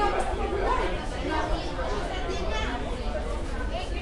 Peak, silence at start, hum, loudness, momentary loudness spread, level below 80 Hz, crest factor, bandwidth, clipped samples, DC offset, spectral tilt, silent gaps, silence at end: -14 dBFS; 0 s; none; -30 LUFS; 6 LU; -32 dBFS; 14 dB; 11.5 kHz; under 0.1%; under 0.1%; -5.5 dB/octave; none; 0 s